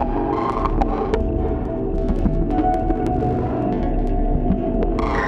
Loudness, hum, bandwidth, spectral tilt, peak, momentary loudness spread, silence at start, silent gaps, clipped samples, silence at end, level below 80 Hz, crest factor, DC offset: -21 LUFS; none; 6 kHz; -9 dB/octave; -2 dBFS; 3 LU; 0 s; none; under 0.1%; 0 s; -24 dBFS; 16 dB; under 0.1%